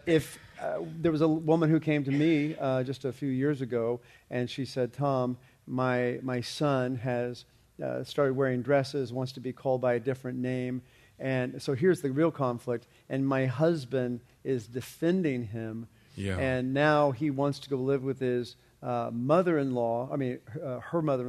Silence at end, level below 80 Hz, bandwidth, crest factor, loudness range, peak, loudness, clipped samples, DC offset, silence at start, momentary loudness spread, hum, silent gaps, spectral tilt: 0 s; -66 dBFS; 13.5 kHz; 20 dB; 3 LU; -10 dBFS; -30 LUFS; under 0.1%; under 0.1%; 0.05 s; 12 LU; none; none; -7 dB/octave